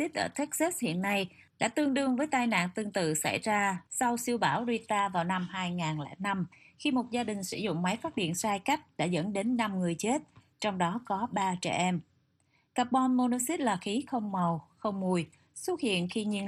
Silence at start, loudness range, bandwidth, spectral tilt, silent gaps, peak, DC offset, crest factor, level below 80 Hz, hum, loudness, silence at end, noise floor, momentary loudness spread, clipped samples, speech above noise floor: 0 s; 3 LU; 15 kHz; -4.5 dB/octave; none; -12 dBFS; under 0.1%; 18 dB; -72 dBFS; none; -31 LUFS; 0 s; -72 dBFS; 6 LU; under 0.1%; 41 dB